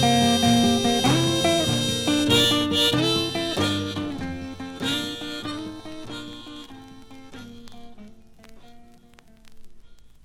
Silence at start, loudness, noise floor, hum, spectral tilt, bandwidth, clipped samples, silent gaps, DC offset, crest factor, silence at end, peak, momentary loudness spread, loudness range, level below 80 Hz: 0 s; -21 LUFS; -51 dBFS; none; -4 dB/octave; 16.5 kHz; under 0.1%; none; under 0.1%; 18 dB; 0.15 s; -6 dBFS; 22 LU; 21 LU; -50 dBFS